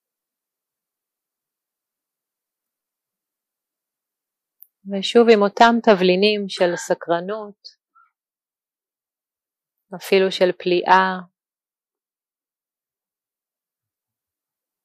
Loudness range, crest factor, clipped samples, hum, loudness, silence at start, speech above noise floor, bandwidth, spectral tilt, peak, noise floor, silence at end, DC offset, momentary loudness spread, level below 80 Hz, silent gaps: 11 LU; 22 dB; under 0.1%; none; -17 LUFS; 4.85 s; over 73 dB; 15 kHz; -5 dB/octave; -2 dBFS; under -90 dBFS; 3.6 s; under 0.1%; 16 LU; -70 dBFS; none